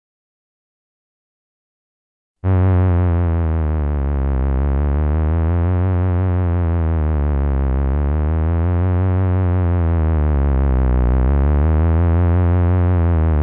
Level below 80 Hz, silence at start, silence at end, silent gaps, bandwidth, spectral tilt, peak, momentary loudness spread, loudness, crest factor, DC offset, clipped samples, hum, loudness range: -22 dBFS; 2.45 s; 0 s; none; 3.3 kHz; -13.5 dB/octave; -10 dBFS; 3 LU; -18 LUFS; 6 dB; under 0.1%; under 0.1%; none; 3 LU